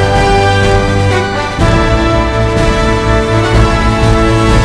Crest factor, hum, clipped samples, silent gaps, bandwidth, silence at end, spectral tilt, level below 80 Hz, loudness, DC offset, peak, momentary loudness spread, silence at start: 10 dB; none; 0.5%; none; 11 kHz; 0 s; -6 dB/octave; -16 dBFS; -10 LUFS; 0.8%; 0 dBFS; 3 LU; 0 s